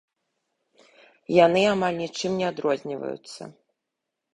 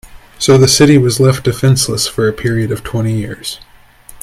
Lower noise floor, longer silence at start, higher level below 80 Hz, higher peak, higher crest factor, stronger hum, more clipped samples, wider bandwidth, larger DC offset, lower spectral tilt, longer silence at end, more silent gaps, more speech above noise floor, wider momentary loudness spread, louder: first, -84 dBFS vs -39 dBFS; first, 1.3 s vs 0.05 s; second, -64 dBFS vs -38 dBFS; second, -4 dBFS vs 0 dBFS; first, 22 dB vs 12 dB; neither; neither; second, 11.5 kHz vs 15.5 kHz; neither; about the same, -5 dB/octave vs -5 dB/octave; first, 0.8 s vs 0 s; neither; first, 60 dB vs 28 dB; first, 20 LU vs 14 LU; second, -23 LUFS vs -12 LUFS